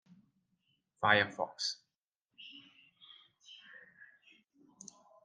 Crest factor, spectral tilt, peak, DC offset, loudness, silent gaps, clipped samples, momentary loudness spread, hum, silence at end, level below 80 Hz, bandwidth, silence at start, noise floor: 30 dB; -3 dB/octave; -12 dBFS; under 0.1%; -32 LUFS; 1.95-2.20 s; under 0.1%; 28 LU; none; 1.7 s; -84 dBFS; 10 kHz; 1 s; -88 dBFS